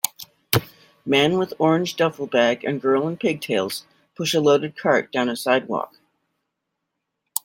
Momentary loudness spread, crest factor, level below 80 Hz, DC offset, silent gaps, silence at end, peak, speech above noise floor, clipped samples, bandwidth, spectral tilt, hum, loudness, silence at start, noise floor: 10 LU; 22 dB; -62 dBFS; under 0.1%; none; 1.6 s; 0 dBFS; 59 dB; under 0.1%; 17 kHz; -4.5 dB/octave; none; -21 LUFS; 0.05 s; -79 dBFS